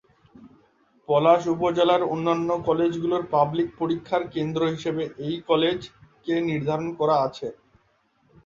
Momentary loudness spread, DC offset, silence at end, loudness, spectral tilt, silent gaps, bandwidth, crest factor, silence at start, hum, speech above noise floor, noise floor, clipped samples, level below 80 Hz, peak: 9 LU; under 0.1%; 0.9 s; -24 LUFS; -7 dB/octave; none; 7.4 kHz; 20 dB; 0.4 s; none; 42 dB; -65 dBFS; under 0.1%; -60 dBFS; -4 dBFS